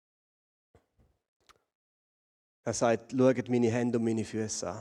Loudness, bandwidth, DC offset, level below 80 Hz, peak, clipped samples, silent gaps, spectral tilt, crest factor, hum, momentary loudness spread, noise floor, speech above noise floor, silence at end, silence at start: -29 LUFS; 11 kHz; under 0.1%; -70 dBFS; -12 dBFS; under 0.1%; none; -5.5 dB/octave; 20 dB; none; 8 LU; -70 dBFS; 42 dB; 0 s; 2.65 s